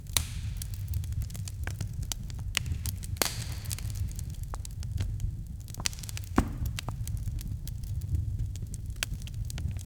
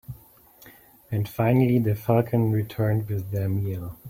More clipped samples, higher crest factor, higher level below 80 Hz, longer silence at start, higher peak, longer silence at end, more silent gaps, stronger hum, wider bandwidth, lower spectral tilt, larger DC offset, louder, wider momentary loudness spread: neither; first, 30 dB vs 18 dB; first, -38 dBFS vs -52 dBFS; about the same, 0 s vs 0.1 s; about the same, -4 dBFS vs -6 dBFS; first, 0.15 s vs 0 s; neither; neither; first, over 20 kHz vs 16.5 kHz; second, -4 dB/octave vs -9 dB/octave; neither; second, -35 LUFS vs -24 LUFS; second, 8 LU vs 11 LU